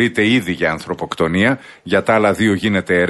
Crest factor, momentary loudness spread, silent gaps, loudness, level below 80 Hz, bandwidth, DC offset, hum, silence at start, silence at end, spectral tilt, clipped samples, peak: 14 dB; 8 LU; none; -16 LUFS; -48 dBFS; 12 kHz; under 0.1%; none; 0 s; 0 s; -5.5 dB/octave; under 0.1%; -2 dBFS